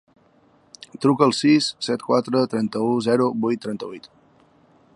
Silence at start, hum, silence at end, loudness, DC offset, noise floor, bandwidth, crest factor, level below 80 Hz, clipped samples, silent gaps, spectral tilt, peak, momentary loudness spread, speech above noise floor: 1 s; none; 0.9 s; -21 LUFS; under 0.1%; -57 dBFS; 11.5 kHz; 20 dB; -68 dBFS; under 0.1%; none; -5.5 dB/octave; -2 dBFS; 14 LU; 37 dB